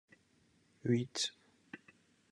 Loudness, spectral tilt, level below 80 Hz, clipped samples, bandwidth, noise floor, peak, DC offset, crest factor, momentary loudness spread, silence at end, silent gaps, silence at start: -37 LUFS; -4.5 dB/octave; -80 dBFS; under 0.1%; 11.5 kHz; -72 dBFS; -20 dBFS; under 0.1%; 22 dB; 20 LU; 0.55 s; none; 0.85 s